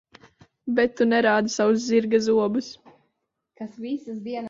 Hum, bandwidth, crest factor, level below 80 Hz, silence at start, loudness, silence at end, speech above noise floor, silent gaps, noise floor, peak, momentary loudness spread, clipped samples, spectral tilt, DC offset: none; 7.6 kHz; 18 dB; -66 dBFS; 0.65 s; -22 LUFS; 0 s; 55 dB; none; -77 dBFS; -6 dBFS; 17 LU; under 0.1%; -4.5 dB/octave; under 0.1%